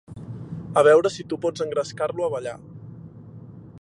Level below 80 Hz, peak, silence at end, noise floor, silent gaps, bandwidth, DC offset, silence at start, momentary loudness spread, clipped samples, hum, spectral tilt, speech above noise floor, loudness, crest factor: -58 dBFS; -4 dBFS; 0 s; -42 dBFS; none; 11 kHz; under 0.1%; 0.1 s; 26 LU; under 0.1%; none; -5.5 dB/octave; 21 dB; -22 LUFS; 20 dB